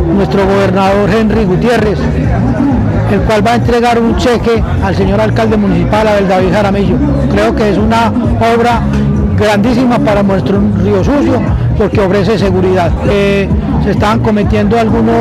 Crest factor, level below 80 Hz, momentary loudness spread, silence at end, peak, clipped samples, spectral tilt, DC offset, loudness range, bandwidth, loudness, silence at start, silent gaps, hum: 8 dB; -20 dBFS; 2 LU; 0 s; 0 dBFS; under 0.1%; -7.5 dB/octave; under 0.1%; 1 LU; 13.5 kHz; -10 LUFS; 0 s; none; none